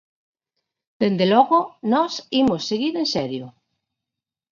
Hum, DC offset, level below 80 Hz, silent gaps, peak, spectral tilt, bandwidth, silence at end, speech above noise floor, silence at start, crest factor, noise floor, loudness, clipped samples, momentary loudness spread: none; under 0.1%; -62 dBFS; none; -4 dBFS; -5.5 dB/octave; 7.4 kHz; 1 s; 67 dB; 1 s; 18 dB; -87 dBFS; -20 LUFS; under 0.1%; 8 LU